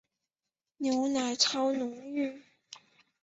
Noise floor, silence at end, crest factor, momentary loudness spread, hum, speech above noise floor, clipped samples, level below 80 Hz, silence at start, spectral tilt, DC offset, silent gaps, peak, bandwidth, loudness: under -90 dBFS; 0.45 s; 22 dB; 24 LU; none; over 59 dB; under 0.1%; -78 dBFS; 0.8 s; -1.5 dB/octave; under 0.1%; none; -12 dBFS; 8.2 kHz; -30 LUFS